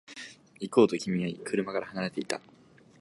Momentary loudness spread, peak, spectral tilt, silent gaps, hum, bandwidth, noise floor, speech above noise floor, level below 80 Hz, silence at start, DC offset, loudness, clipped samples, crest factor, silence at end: 19 LU; -8 dBFS; -5.5 dB/octave; none; none; 11.5 kHz; -48 dBFS; 19 dB; -70 dBFS; 0.1 s; under 0.1%; -29 LUFS; under 0.1%; 22 dB; 0.6 s